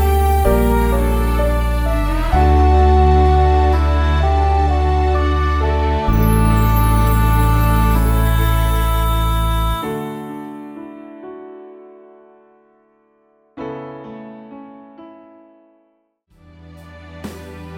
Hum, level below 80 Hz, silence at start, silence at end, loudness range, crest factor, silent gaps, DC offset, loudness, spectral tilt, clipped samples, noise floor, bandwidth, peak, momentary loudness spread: none; -18 dBFS; 0 s; 0 s; 21 LU; 14 dB; none; under 0.1%; -16 LUFS; -7 dB/octave; under 0.1%; -62 dBFS; over 20 kHz; -2 dBFS; 21 LU